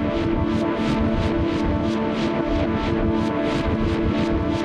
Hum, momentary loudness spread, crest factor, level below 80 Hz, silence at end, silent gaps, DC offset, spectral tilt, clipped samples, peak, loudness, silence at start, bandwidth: none; 1 LU; 12 dB; -32 dBFS; 0 s; none; under 0.1%; -7.5 dB/octave; under 0.1%; -10 dBFS; -22 LUFS; 0 s; 9.6 kHz